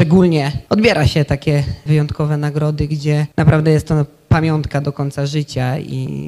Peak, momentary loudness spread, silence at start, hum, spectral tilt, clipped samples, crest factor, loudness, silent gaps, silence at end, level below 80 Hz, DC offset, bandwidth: -2 dBFS; 8 LU; 0 s; none; -7.5 dB/octave; under 0.1%; 14 dB; -16 LUFS; none; 0 s; -34 dBFS; under 0.1%; 12 kHz